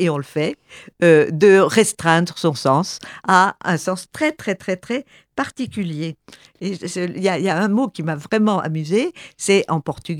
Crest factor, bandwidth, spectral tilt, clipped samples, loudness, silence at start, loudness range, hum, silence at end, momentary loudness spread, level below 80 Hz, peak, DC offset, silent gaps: 18 dB; 15.5 kHz; -5 dB/octave; under 0.1%; -19 LUFS; 0 s; 9 LU; none; 0 s; 13 LU; -60 dBFS; 0 dBFS; under 0.1%; none